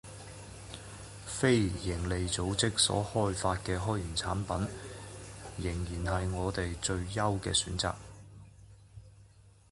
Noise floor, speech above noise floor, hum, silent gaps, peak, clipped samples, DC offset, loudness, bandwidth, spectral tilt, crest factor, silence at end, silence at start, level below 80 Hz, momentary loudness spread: -59 dBFS; 27 dB; none; none; -12 dBFS; under 0.1%; under 0.1%; -32 LUFS; 11.5 kHz; -4 dB/octave; 20 dB; 0.2 s; 0.05 s; -46 dBFS; 18 LU